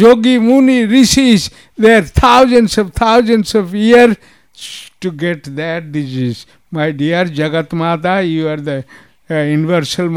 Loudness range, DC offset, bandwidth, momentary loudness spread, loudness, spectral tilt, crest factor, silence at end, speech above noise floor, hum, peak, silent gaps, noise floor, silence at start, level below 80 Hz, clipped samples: 8 LU; 0.2%; 16 kHz; 15 LU; -12 LUFS; -5 dB/octave; 12 dB; 0 s; 21 dB; none; 0 dBFS; none; -32 dBFS; 0 s; -32 dBFS; under 0.1%